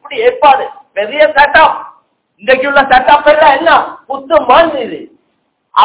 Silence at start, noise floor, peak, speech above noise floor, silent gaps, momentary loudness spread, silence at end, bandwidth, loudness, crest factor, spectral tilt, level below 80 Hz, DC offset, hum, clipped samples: 0.1 s; -61 dBFS; 0 dBFS; 53 dB; none; 14 LU; 0 s; 4 kHz; -8 LUFS; 10 dB; -6.5 dB/octave; -42 dBFS; under 0.1%; none; 5%